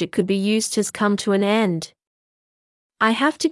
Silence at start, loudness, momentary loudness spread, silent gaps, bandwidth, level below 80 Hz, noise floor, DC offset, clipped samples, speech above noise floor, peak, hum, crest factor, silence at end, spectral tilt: 0 s; -20 LUFS; 5 LU; 2.07-2.90 s; 12 kHz; -66 dBFS; under -90 dBFS; under 0.1%; under 0.1%; over 70 dB; -6 dBFS; none; 16 dB; 0 s; -4.5 dB/octave